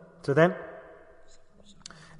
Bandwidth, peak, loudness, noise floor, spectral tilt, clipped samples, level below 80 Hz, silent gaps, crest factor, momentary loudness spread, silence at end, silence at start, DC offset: 10.5 kHz; -8 dBFS; -25 LUFS; -52 dBFS; -7 dB/octave; under 0.1%; -60 dBFS; none; 22 dB; 25 LU; 1.4 s; 0.25 s; under 0.1%